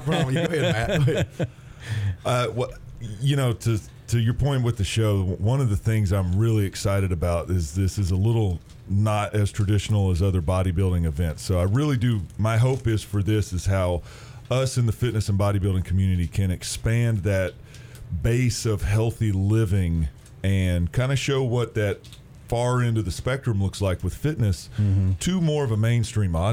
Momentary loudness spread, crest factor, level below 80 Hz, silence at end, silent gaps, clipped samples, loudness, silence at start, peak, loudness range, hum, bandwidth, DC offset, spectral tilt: 6 LU; 12 dB; -40 dBFS; 0 s; none; under 0.1%; -24 LUFS; 0 s; -10 dBFS; 2 LU; none; 15.5 kHz; under 0.1%; -6.5 dB/octave